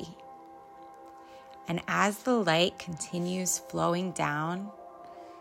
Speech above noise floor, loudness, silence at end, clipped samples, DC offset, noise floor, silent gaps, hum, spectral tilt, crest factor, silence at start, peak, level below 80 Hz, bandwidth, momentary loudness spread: 20 dB; -30 LUFS; 0 s; under 0.1%; under 0.1%; -50 dBFS; none; none; -4 dB/octave; 22 dB; 0 s; -10 dBFS; -68 dBFS; 16 kHz; 23 LU